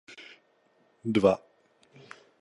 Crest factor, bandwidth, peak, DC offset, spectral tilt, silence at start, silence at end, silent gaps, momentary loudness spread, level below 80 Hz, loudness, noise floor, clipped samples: 22 dB; 11.5 kHz; -8 dBFS; under 0.1%; -7 dB/octave; 0.1 s; 1.05 s; none; 26 LU; -64 dBFS; -27 LUFS; -67 dBFS; under 0.1%